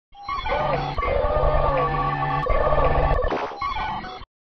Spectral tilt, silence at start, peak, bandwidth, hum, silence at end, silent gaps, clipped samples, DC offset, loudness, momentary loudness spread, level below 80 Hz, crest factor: -7.5 dB/octave; 0.15 s; -6 dBFS; 6.2 kHz; none; 0.2 s; none; under 0.1%; under 0.1%; -23 LUFS; 8 LU; -28 dBFS; 16 dB